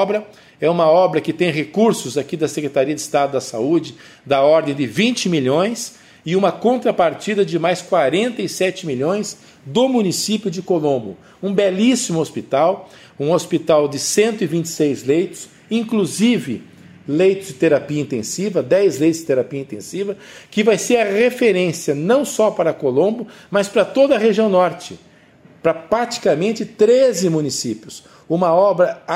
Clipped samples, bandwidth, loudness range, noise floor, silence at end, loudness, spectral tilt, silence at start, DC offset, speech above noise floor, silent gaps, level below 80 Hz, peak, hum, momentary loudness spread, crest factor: under 0.1%; 16 kHz; 2 LU; -48 dBFS; 0 s; -17 LUFS; -5 dB/octave; 0 s; under 0.1%; 30 dB; none; -62 dBFS; -2 dBFS; none; 11 LU; 14 dB